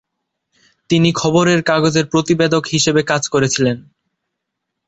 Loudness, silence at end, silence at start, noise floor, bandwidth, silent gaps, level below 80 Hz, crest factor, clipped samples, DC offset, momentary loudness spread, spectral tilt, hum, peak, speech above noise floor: -15 LUFS; 1.05 s; 0.9 s; -77 dBFS; 8.2 kHz; none; -52 dBFS; 16 dB; under 0.1%; under 0.1%; 4 LU; -4.5 dB/octave; none; -2 dBFS; 62 dB